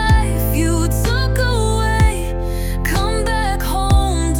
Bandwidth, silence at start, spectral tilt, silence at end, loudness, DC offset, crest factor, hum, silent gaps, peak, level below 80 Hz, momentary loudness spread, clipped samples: 17.5 kHz; 0 s; -5 dB/octave; 0 s; -18 LUFS; under 0.1%; 12 dB; none; none; -2 dBFS; -18 dBFS; 6 LU; under 0.1%